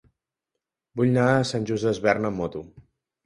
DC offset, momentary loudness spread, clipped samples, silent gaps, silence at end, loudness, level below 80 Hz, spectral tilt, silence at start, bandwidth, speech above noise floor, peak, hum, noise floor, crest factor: under 0.1%; 12 LU; under 0.1%; none; 0.45 s; -24 LUFS; -56 dBFS; -6.5 dB/octave; 0.95 s; 11.5 kHz; 62 dB; -4 dBFS; none; -85 dBFS; 20 dB